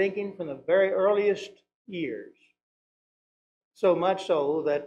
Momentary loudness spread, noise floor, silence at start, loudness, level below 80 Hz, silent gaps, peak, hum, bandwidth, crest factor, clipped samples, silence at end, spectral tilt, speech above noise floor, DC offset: 12 LU; under -90 dBFS; 0 s; -26 LUFS; -72 dBFS; 1.75-1.85 s, 2.63-3.71 s; -12 dBFS; 60 Hz at -65 dBFS; 9.2 kHz; 16 dB; under 0.1%; 0 s; -6 dB/octave; over 64 dB; under 0.1%